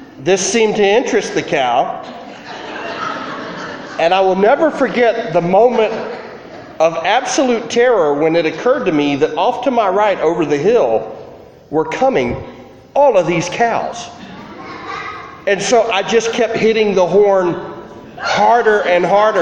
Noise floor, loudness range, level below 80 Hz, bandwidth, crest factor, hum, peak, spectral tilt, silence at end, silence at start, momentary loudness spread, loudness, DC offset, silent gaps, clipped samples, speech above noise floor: -37 dBFS; 3 LU; -50 dBFS; 10 kHz; 14 dB; none; 0 dBFS; -4 dB/octave; 0 s; 0 s; 17 LU; -14 LUFS; under 0.1%; none; under 0.1%; 23 dB